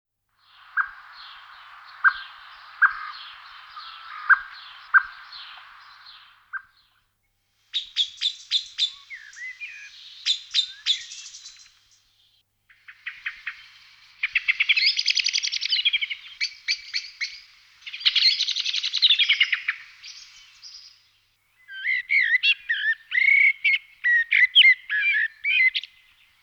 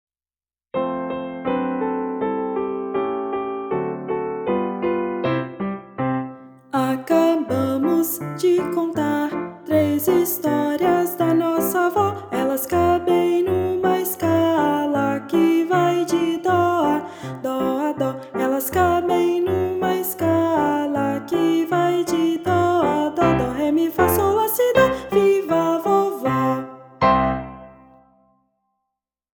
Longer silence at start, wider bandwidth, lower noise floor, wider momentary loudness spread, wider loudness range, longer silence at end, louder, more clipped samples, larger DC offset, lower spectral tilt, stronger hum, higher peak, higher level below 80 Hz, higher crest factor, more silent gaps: about the same, 0.75 s vs 0.75 s; about the same, 19 kHz vs over 20 kHz; second, -71 dBFS vs under -90 dBFS; first, 23 LU vs 8 LU; first, 11 LU vs 6 LU; second, 0.6 s vs 1.6 s; about the same, -21 LUFS vs -20 LUFS; neither; neither; second, 6 dB/octave vs -6 dB/octave; neither; about the same, -4 dBFS vs -4 dBFS; second, -72 dBFS vs -50 dBFS; first, 22 dB vs 16 dB; neither